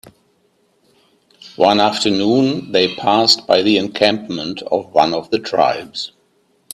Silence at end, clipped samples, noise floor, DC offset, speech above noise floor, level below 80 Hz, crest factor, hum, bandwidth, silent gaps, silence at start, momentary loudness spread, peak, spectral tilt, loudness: 0.65 s; under 0.1%; -60 dBFS; under 0.1%; 44 dB; -58 dBFS; 18 dB; none; 14 kHz; none; 0.05 s; 11 LU; 0 dBFS; -4 dB/octave; -16 LUFS